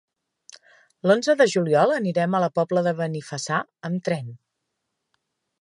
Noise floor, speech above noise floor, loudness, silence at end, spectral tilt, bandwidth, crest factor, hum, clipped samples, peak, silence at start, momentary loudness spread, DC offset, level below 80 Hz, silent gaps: -79 dBFS; 57 dB; -22 LUFS; 1.25 s; -5.5 dB/octave; 11.5 kHz; 18 dB; none; under 0.1%; -6 dBFS; 0.5 s; 10 LU; under 0.1%; -74 dBFS; none